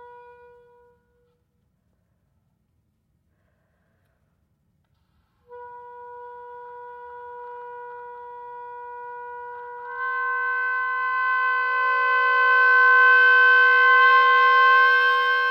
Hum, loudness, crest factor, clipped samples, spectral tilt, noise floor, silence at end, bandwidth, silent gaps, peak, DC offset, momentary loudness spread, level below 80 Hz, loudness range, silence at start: none; -17 LUFS; 14 dB; under 0.1%; 0 dB/octave; -69 dBFS; 0 s; 6.6 kHz; none; -8 dBFS; under 0.1%; 26 LU; -74 dBFS; 25 LU; 5.5 s